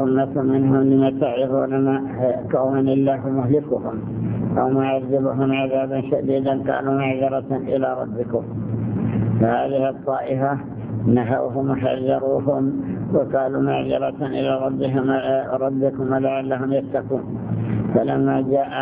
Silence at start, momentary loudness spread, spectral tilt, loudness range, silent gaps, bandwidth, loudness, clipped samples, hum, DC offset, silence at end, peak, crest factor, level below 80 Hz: 0 s; 6 LU; -12 dB/octave; 3 LU; none; 3.8 kHz; -21 LUFS; under 0.1%; none; under 0.1%; 0 s; -4 dBFS; 16 dB; -50 dBFS